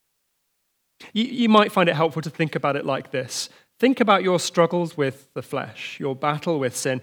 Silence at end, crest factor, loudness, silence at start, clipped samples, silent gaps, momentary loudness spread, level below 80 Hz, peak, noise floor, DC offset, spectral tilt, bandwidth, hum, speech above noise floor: 0 s; 20 dB; -22 LUFS; 1 s; under 0.1%; none; 12 LU; -76 dBFS; -2 dBFS; -72 dBFS; under 0.1%; -5 dB/octave; 19.5 kHz; none; 50 dB